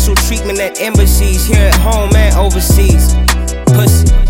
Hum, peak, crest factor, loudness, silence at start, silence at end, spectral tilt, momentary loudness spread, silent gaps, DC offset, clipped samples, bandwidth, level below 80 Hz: none; 0 dBFS; 8 dB; -10 LUFS; 0 s; 0 s; -5 dB/octave; 5 LU; none; under 0.1%; under 0.1%; 17 kHz; -10 dBFS